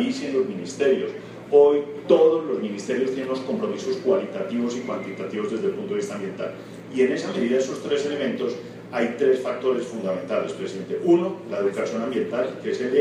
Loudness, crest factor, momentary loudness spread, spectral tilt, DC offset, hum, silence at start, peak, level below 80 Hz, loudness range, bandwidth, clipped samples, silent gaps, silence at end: -24 LUFS; 20 dB; 11 LU; -5.5 dB/octave; under 0.1%; none; 0 s; -4 dBFS; -70 dBFS; 5 LU; 10.5 kHz; under 0.1%; none; 0 s